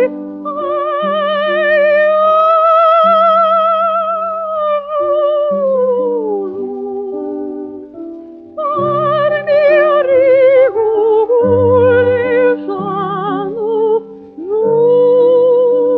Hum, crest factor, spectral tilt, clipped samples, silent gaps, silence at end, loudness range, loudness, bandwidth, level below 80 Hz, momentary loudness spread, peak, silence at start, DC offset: none; 12 dB; -8.5 dB/octave; under 0.1%; none; 0 s; 7 LU; -12 LUFS; 5.2 kHz; -58 dBFS; 13 LU; 0 dBFS; 0 s; under 0.1%